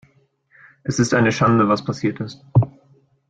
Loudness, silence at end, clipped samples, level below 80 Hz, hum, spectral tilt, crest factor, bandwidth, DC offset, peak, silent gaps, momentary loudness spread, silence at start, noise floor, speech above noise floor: -19 LUFS; 0.6 s; under 0.1%; -50 dBFS; none; -6 dB/octave; 16 dB; 9 kHz; under 0.1%; -4 dBFS; none; 12 LU; 0.85 s; -59 dBFS; 41 dB